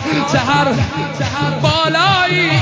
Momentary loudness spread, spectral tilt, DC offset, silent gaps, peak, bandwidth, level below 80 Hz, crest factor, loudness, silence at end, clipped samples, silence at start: 7 LU; -5 dB/octave; under 0.1%; none; -4 dBFS; 8 kHz; -36 dBFS; 12 dB; -14 LUFS; 0 s; under 0.1%; 0 s